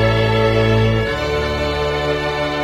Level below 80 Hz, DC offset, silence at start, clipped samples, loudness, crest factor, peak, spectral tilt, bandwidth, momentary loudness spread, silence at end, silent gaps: -28 dBFS; under 0.1%; 0 s; under 0.1%; -17 LUFS; 14 dB; -4 dBFS; -6.5 dB/octave; 12.5 kHz; 4 LU; 0 s; none